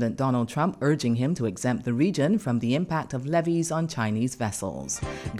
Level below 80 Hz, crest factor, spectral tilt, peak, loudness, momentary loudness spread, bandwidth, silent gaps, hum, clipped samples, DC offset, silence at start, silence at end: -52 dBFS; 16 dB; -6 dB/octave; -10 dBFS; -26 LUFS; 6 LU; 14.5 kHz; none; none; under 0.1%; under 0.1%; 0 s; 0 s